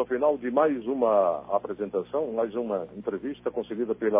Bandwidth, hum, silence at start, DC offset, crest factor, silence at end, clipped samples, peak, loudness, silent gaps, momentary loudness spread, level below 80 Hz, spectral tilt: 3.8 kHz; 60 Hz at -55 dBFS; 0 s; under 0.1%; 16 dB; 0 s; under 0.1%; -10 dBFS; -27 LUFS; none; 9 LU; -64 dBFS; -10 dB/octave